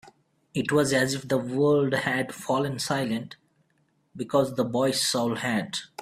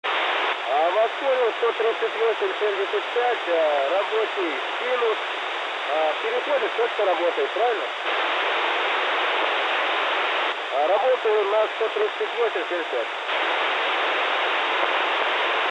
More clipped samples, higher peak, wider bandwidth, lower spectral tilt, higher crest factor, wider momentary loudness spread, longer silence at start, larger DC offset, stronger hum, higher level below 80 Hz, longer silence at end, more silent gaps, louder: neither; about the same, -8 dBFS vs -8 dBFS; first, 16 kHz vs 10 kHz; first, -4.5 dB/octave vs -0.5 dB/octave; about the same, 18 dB vs 14 dB; first, 9 LU vs 4 LU; about the same, 0.05 s vs 0.05 s; neither; neither; first, -64 dBFS vs under -90 dBFS; about the same, 0 s vs 0 s; neither; second, -26 LUFS vs -23 LUFS